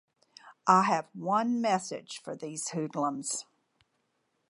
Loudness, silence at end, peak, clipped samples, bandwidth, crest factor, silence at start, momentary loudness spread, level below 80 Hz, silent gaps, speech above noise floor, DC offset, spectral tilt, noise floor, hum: -30 LUFS; 1.05 s; -8 dBFS; under 0.1%; 11.5 kHz; 24 dB; 0.45 s; 15 LU; -86 dBFS; none; 48 dB; under 0.1%; -4 dB/octave; -77 dBFS; none